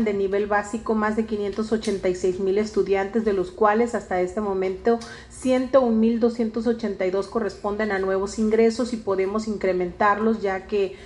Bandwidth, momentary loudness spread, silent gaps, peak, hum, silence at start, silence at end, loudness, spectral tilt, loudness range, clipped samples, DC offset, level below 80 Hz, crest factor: 11.5 kHz; 6 LU; none; -4 dBFS; none; 0 s; 0 s; -23 LUFS; -6 dB/octave; 1 LU; under 0.1%; under 0.1%; -48 dBFS; 18 dB